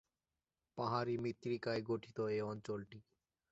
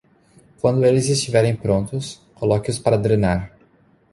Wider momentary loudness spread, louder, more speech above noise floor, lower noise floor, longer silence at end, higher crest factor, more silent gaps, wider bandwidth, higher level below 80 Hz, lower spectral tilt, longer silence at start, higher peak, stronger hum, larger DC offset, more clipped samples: about the same, 12 LU vs 11 LU; second, -41 LUFS vs -19 LUFS; first, over 49 dB vs 38 dB; first, under -90 dBFS vs -56 dBFS; second, 0.5 s vs 0.65 s; about the same, 20 dB vs 18 dB; neither; second, 8 kHz vs 11.5 kHz; second, -76 dBFS vs -42 dBFS; about the same, -5.5 dB/octave vs -6 dB/octave; about the same, 0.75 s vs 0.65 s; second, -22 dBFS vs -2 dBFS; neither; neither; neither